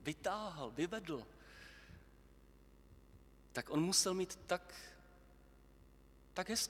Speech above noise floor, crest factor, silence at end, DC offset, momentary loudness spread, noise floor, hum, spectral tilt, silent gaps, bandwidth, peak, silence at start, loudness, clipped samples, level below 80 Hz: 24 dB; 24 dB; 0 s; under 0.1%; 24 LU; -64 dBFS; 50 Hz at -65 dBFS; -3 dB/octave; none; 18.5 kHz; -18 dBFS; 0 s; -40 LUFS; under 0.1%; -66 dBFS